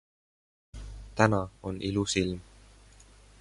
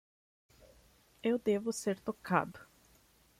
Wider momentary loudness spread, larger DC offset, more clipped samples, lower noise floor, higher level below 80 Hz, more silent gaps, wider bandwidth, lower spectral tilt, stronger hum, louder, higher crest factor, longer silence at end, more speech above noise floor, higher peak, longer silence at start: first, 21 LU vs 10 LU; neither; neither; second, -55 dBFS vs -66 dBFS; first, -48 dBFS vs -70 dBFS; neither; second, 11.5 kHz vs 16 kHz; about the same, -5 dB/octave vs -5.5 dB/octave; neither; first, -29 LUFS vs -35 LUFS; about the same, 26 dB vs 22 dB; first, 1 s vs 0.75 s; second, 27 dB vs 33 dB; first, -6 dBFS vs -14 dBFS; second, 0.75 s vs 1.25 s